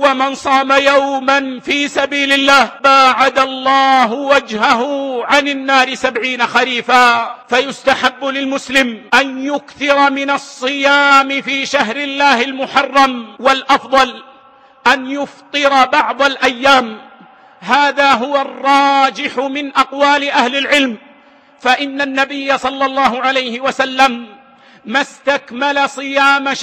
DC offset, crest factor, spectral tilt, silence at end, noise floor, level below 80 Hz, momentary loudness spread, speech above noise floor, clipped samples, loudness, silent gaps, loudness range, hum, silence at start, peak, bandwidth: under 0.1%; 14 dB; -2 dB/octave; 0 s; -45 dBFS; -54 dBFS; 8 LU; 32 dB; under 0.1%; -13 LUFS; none; 4 LU; none; 0 s; 0 dBFS; 15.5 kHz